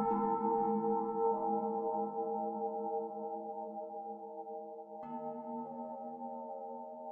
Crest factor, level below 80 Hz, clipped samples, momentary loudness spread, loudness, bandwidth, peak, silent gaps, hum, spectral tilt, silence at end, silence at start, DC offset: 16 dB; -76 dBFS; under 0.1%; 13 LU; -38 LUFS; 2.8 kHz; -22 dBFS; none; none; -11.5 dB/octave; 0 s; 0 s; under 0.1%